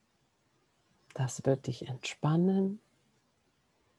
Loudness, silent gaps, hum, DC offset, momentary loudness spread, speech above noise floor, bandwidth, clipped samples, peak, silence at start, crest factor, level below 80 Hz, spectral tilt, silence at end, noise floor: -32 LUFS; none; none; under 0.1%; 12 LU; 43 dB; 12 kHz; under 0.1%; -14 dBFS; 1.15 s; 20 dB; -76 dBFS; -6.5 dB/octave; 1.2 s; -74 dBFS